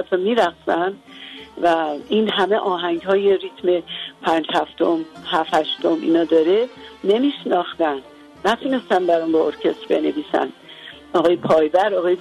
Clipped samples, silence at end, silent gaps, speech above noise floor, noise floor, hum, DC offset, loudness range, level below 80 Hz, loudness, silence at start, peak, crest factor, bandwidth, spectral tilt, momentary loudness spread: under 0.1%; 0 s; none; 21 dB; -40 dBFS; none; under 0.1%; 1 LU; -60 dBFS; -19 LUFS; 0 s; -4 dBFS; 14 dB; 12 kHz; -5.5 dB/octave; 9 LU